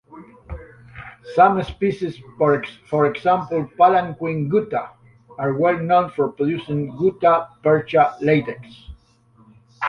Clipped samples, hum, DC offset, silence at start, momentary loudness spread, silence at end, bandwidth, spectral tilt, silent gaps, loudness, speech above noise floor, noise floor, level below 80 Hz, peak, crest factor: under 0.1%; none; under 0.1%; 0.1 s; 21 LU; 0 s; 6.6 kHz; -8.5 dB/octave; none; -19 LUFS; 36 dB; -55 dBFS; -48 dBFS; -2 dBFS; 18 dB